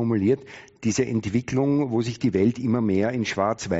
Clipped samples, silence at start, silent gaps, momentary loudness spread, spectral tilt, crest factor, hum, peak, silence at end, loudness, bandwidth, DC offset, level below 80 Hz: under 0.1%; 0 s; none; 4 LU; -6.5 dB/octave; 14 dB; none; -8 dBFS; 0 s; -24 LUFS; 8 kHz; under 0.1%; -56 dBFS